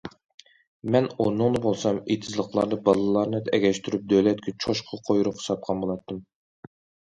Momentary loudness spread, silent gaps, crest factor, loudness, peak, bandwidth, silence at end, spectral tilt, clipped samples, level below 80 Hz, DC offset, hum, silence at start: 9 LU; 0.25-0.38 s, 0.67-0.80 s; 20 dB; -25 LUFS; -4 dBFS; 11 kHz; 0.9 s; -6 dB/octave; under 0.1%; -58 dBFS; under 0.1%; none; 0.05 s